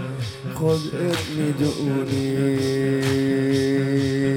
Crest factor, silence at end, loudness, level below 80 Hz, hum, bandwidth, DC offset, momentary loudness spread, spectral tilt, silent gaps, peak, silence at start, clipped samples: 12 dB; 0 s; -22 LUFS; -54 dBFS; none; 16.5 kHz; under 0.1%; 4 LU; -6.5 dB/octave; none; -8 dBFS; 0 s; under 0.1%